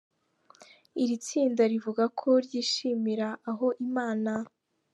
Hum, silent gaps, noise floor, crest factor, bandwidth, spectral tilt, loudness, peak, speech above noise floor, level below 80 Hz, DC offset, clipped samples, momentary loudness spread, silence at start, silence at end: none; none; -62 dBFS; 16 dB; 11 kHz; -4.5 dB/octave; -29 LUFS; -12 dBFS; 34 dB; -84 dBFS; under 0.1%; under 0.1%; 8 LU; 0.6 s; 0.45 s